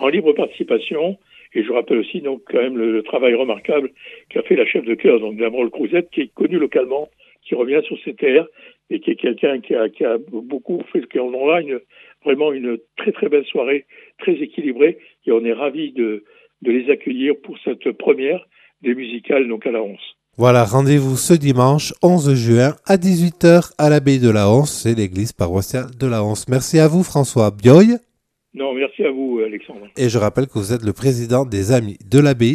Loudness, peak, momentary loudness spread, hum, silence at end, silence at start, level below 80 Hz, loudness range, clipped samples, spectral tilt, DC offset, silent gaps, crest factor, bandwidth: -17 LUFS; 0 dBFS; 11 LU; none; 0 s; 0 s; -52 dBFS; 6 LU; under 0.1%; -6.5 dB/octave; under 0.1%; none; 16 dB; 15 kHz